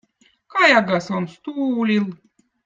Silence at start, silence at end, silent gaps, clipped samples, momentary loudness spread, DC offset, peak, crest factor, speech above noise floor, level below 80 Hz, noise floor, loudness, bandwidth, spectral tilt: 0.55 s; 0.5 s; none; under 0.1%; 13 LU; under 0.1%; -2 dBFS; 20 dB; 37 dB; -66 dBFS; -56 dBFS; -19 LUFS; 7.6 kHz; -5.5 dB/octave